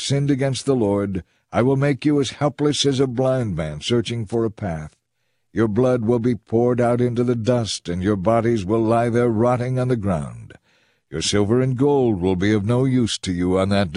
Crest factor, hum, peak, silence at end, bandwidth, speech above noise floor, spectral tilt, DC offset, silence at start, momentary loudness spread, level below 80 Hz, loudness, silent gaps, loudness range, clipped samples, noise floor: 16 dB; none; -4 dBFS; 0 s; 11 kHz; 54 dB; -6 dB/octave; under 0.1%; 0 s; 7 LU; -48 dBFS; -20 LUFS; none; 3 LU; under 0.1%; -73 dBFS